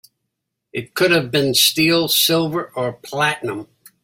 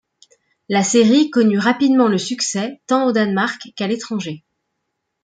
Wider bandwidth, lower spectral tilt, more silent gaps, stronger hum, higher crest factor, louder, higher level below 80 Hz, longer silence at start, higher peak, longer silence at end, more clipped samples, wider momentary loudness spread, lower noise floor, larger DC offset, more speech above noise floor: first, 16.5 kHz vs 9.4 kHz; second, -3 dB/octave vs -4.5 dB/octave; neither; neither; about the same, 18 dB vs 16 dB; about the same, -17 LUFS vs -17 LUFS; first, -58 dBFS vs -66 dBFS; about the same, 0.75 s vs 0.7 s; about the same, -2 dBFS vs -2 dBFS; second, 0.4 s vs 0.85 s; neither; first, 14 LU vs 11 LU; about the same, -78 dBFS vs -75 dBFS; neither; about the same, 59 dB vs 59 dB